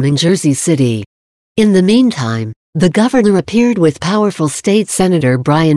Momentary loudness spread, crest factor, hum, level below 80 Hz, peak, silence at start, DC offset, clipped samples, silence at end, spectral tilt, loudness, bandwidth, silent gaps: 7 LU; 10 dB; none; -48 dBFS; 0 dBFS; 0 s; under 0.1%; under 0.1%; 0 s; -5.5 dB/octave; -12 LUFS; 13 kHz; 1.06-1.55 s, 2.56-2.73 s